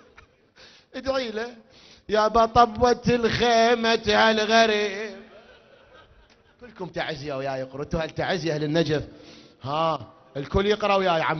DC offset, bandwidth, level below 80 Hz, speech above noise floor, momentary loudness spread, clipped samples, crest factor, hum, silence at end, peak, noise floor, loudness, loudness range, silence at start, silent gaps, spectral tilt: under 0.1%; 6.6 kHz; -46 dBFS; 34 dB; 16 LU; under 0.1%; 20 dB; none; 0 s; -4 dBFS; -56 dBFS; -23 LUFS; 11 LU; 0.95 s; none; -4.5 dB/octave